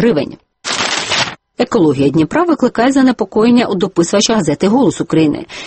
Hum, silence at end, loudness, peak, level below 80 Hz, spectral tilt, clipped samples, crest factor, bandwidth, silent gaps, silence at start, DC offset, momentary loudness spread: none; 0 s; -13 LUFS; 0 dBFS; -46 dBFS; -4.5 dB/octave; under 0.1%; 12 dB; 8.8 kHz; none; 0 s; under 0.1%; 7 LU